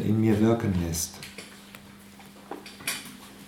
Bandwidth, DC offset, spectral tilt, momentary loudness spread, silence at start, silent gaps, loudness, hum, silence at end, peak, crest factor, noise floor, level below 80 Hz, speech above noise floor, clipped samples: 17 kHz; under 0.1%; -5.5 dB/octave; 25 LU; 0 s; none; -27 LUFS; none; 0 s; -10 dBFS; 18 dB; -48 dBFS; -52 dBFS; 24 dB; under 0.1%